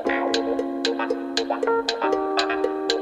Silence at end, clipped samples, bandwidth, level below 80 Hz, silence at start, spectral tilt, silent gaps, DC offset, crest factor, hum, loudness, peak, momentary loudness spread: 0 s; under 0.1%; 12 kHz; -58 dBFS; 0 s; -2 dB/octave; none; under 0.1%; 18 dB; none; -24 LUFS; -6 dBFS; 3 LU